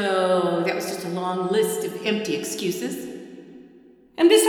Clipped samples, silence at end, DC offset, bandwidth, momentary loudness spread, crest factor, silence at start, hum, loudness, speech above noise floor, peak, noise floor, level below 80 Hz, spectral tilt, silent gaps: under 0.1%; 0 s; under 0.1%; over 20 kHz; 17 LU; 20 dB; 0 s; none; -24 LUFS; 30 dB; -4 dBFS; -51 dBFS; -70 dBFS; -4 dB/octave; none